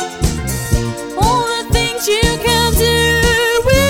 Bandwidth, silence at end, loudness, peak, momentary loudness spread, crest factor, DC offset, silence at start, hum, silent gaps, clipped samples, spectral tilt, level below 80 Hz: 18 kHz; 0 s; -14 LUFS; 0 dBFS; 7 LU; 14 dB; 0.2%; 0 s; none; none; under 0.1%; -3.5 dB/octave; -22 dBFS